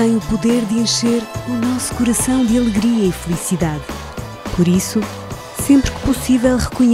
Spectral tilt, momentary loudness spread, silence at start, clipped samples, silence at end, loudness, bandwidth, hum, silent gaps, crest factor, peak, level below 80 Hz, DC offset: -5 dB/octave; 12 LU; 0 s; under 0.1%; 0 s; -17 LUFS; 16 kHz; none; none; 16 dB; 0 dBFS; -32 dBFS; under 0.1%